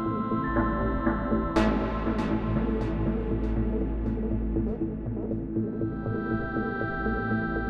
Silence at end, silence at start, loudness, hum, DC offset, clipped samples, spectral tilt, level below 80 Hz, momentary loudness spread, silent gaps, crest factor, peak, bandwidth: 0 s; 0 s; -29 LUFS; none; under 0.1%; under 0.1%; -8.5 dB/octave; -34 dBFS; 5 LU; none; 18 dB; -8 dBFS; 7.8 kHz